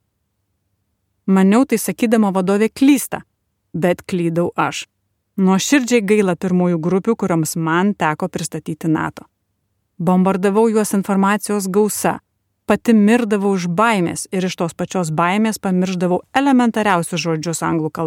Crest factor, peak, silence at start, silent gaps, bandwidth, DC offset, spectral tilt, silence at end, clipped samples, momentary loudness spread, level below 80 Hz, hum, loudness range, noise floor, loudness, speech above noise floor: 16 dB; -2 dBFS; 1.25 s; none; 17 kHz; under 0.1%; -5.5 dB/octave; 0 s; under 0.1%; 9 LU; -58 dBFS; none; 2 LU; -70 dBFS; -17 LUFS; 54 dB